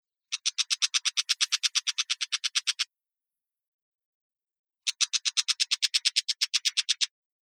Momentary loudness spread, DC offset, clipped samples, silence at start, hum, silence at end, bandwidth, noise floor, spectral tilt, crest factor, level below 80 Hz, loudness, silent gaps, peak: 6 LU; under 0.1%; under 0.1%; 0.3 s; none; 0.4 s; 19 kHz; under -90 dBFS; 13.5 dB/octave; 24 dB; under -90 dBFS; -26 LUFS; 3.67-3.99 s, 4.05-4.30 s, 4.59-4.64 s; -8 dBFS